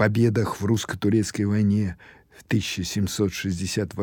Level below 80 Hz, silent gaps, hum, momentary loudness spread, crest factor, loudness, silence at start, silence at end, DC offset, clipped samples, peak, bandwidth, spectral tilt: -54 dBFS; none; none; 6 LU; 18 dB; -24 LUFS; 0 s; 0 s; under 0.1%; under 0.1%; -6 dBFS; 18.5 kHz; -5.5 dB/octave